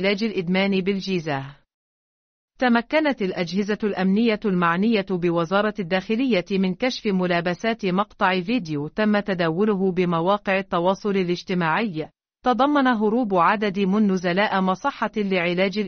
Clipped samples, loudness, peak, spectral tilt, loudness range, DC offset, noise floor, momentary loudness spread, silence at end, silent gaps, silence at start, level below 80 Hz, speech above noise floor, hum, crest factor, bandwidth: under 0.1%; -22 LUFS; -6 dBFS; -4.5 dB/octave; 3 LU; under 0.1%; under -90 dBFS; 6 LU; 0 s; 1.74-2.48 s; 0 s; -58 dBFS; over 69 dB; none; 16 dB; 6.6 kHz